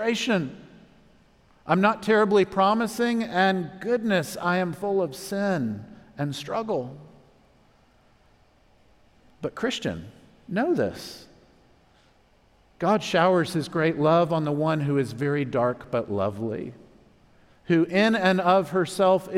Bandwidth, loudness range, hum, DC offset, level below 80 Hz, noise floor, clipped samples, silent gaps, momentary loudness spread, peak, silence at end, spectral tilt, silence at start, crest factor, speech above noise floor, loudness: 16 kHz; 12 LU; none; under 0.1%; -62 dBFS; -60 dBFS; under 0.1%; none; 12 LU; -6 dBFS; 0 s; -6 dB/octave; 0 s; 20 dB; 36 dB; -24 LUFS